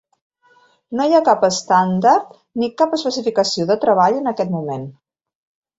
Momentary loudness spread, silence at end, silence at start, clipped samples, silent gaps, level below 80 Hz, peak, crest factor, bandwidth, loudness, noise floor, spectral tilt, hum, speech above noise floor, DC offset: 12 LU; 0.85 s; 0.9 s; under 0.1%; none; -64 dBFS; -2 dBFS; 16 dB; 8 kHz; -17 LUFS; -55 dBFS; -5 dB/octave; none; 39 dB; under 0.1%